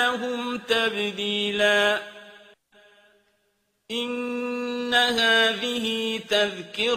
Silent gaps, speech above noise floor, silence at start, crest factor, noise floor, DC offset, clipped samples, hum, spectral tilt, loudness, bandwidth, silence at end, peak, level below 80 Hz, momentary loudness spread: none; 47 dB; 0 s; 20 dB; -71 dBFS; under 0.1%; under 0.1%; none; -2.5 dB/octave; -23 LUFS; 15.5 kHz; 0 s; -6 dBFS; -66 dBFS; 10 LU